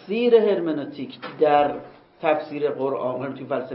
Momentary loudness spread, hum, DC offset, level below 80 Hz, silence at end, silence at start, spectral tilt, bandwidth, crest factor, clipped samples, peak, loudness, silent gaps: 15 LU; none; under 0.1%; -66 dBFS; 0 s; 0 s; -10.5 dB/octave; 5.6 kHz; 18 dB; under 0.1%; -4 dBFS; -22 LUFS; none